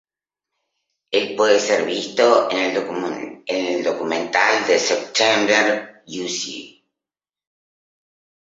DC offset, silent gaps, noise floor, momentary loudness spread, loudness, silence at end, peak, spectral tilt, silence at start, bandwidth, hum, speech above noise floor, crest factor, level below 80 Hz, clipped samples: under 0.1%; none; -90 dBFS; 11 LU; -19 LUFS; 1.75 s; 0 dBFS; -2 dB/octave; 1.1 s; 8 kHz; none; 71 dB; 20 dB; -68 dBFS; under 0.1%